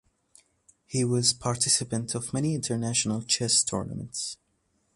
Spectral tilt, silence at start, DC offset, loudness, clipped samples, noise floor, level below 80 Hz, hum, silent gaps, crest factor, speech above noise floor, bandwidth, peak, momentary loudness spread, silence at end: -3.5 dB/octave; 0.9 s; under 0.1%; -26 LUFS; under 0.1%; -72 dBFS; -58 dBFS; none; none; 20 dB; 45 dB; 11.5 kHz; -8 dBFS; 11 LU; 0.6 s